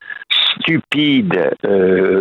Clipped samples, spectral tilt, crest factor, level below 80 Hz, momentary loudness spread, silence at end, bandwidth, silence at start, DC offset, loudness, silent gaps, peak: under 0.1%; -6.5 dB/octave; 10 dB; -58 dBFS; 4 LU; 0 s; 9.4 kHz; 0 s; under 0.1%; -14 LUFS; none; -4 dBFS